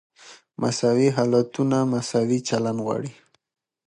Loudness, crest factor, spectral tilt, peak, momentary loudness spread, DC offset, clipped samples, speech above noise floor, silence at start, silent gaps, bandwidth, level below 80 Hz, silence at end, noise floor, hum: -23 LUFS; 18 dB; -6 dB/octave; -6 dBFS; 9 LU; under 0.1%; under 0.1%; 21 dB; 0.25 s; none; 11 kHz; -66 dBFS; 0.75 s; -43 dBFS; none